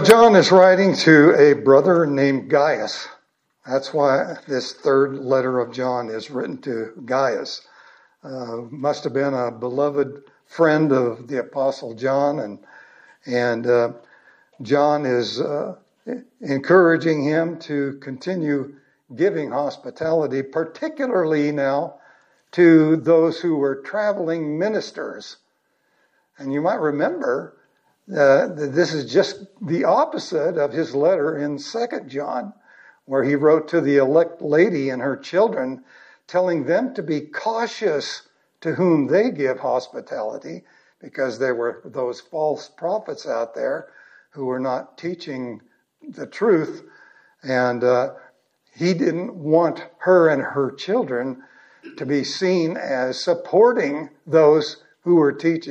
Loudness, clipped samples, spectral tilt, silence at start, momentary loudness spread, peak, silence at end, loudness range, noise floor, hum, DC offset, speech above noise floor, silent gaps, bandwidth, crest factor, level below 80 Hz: -20 LUFS; under 0.1%; -6 dB/octave; 0 s; 16 LU; 0 dBFS; 0 s; 7 LU; -68 dBFS; none; under 0.1%; 48 dB; none; 15 kHz; 20 dB; -72 dBFS